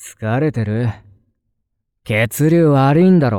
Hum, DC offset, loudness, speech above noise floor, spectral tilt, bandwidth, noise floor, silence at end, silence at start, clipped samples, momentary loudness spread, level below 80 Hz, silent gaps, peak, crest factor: none; under 0.1%; -15 LUFS; 58 dB; -7.5 dB/octave; 17 kHz; -72 dBFS; 0 s; 0 s; under 0.1%; 9 LU; -50 dBFS; none; -4 dBFS; 12 dB